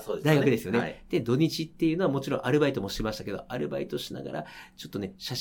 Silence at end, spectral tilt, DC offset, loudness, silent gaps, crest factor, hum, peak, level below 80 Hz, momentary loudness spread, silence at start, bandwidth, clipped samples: 0 s; -6 dB/octave; under 0.1%; -28 LUFS; none; 20 dB; none; -8 dBFS; -52 dBFS; 12 LU; 0 s; 18.5 kHz; under 0.1%